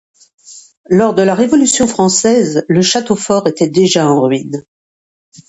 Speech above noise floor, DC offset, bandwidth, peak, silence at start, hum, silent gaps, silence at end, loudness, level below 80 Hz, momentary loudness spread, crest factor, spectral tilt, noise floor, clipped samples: over 79 dB; under 0.1%; 11 kHz; 0 dBFS; 0.5 s; none; 0.77-0.84 s; 0.85 s; -11 LUFS; -50 dBFS; 5 LU; 12 dB; -4.5 dB/octave; under -90 dBFS; under 0.1%